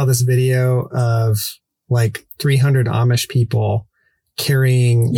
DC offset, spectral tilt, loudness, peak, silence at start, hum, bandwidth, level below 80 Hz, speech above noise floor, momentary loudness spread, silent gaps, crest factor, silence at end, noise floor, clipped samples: under 0.1%; -6 dB/octave; -17 LUFS; -4 dBFS; 0 s; none; 19 kHz; -52 dBFS; 47 dB; 7 LU; none; 12 dB; 0 s; -62 dBFS; under 0.1%